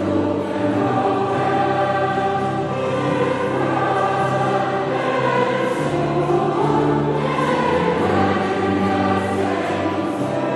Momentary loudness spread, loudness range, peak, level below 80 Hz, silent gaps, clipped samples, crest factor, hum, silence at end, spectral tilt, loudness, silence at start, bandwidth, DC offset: 3 LU; 1 LU; -4 dBFS; -50 dBFS; none; under 0.1%; 14 dB; none; 0 s; -7 dB/octave; -19 LUFS; 0 s; 12 kHz; under 0.1%